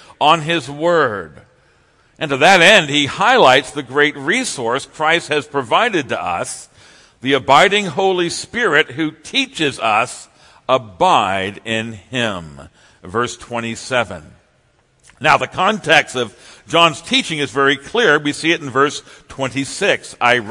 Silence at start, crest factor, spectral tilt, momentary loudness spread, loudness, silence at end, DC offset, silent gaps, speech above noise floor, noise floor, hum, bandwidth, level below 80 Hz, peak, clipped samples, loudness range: 0.2 s; 16 dB; -3.5 dB/octave; 13 LU; -15 LUFS; 0 s; under 0.1%; none; 41 dB; -57 dBFS; none; 12 kHz; -54 dBFS; 0 dBFS; 0.1%; 7 LU